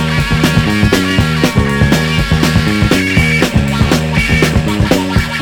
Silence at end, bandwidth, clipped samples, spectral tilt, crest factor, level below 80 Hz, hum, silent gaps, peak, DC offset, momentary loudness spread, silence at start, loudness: 0 s; 18.5 kHz; 0.2%; -5.5 dB/octave; 12 dB; -22 dBFS; none; none; 0 dBFS; under 0.1%; 2 LU; 0 s; -11 LUFS